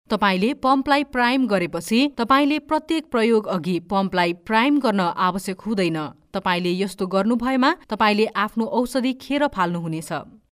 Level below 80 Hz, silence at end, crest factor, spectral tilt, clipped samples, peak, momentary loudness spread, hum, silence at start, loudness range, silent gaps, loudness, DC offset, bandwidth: -54 dBFS; 0.25 s; 16 dB; -5.5 dB/octave; under 0.1%; -4 dBFS; 6 LU; none; 0.1 s; 2 LU; none; -21 LUFS; under 0.1%; 15.5 kHz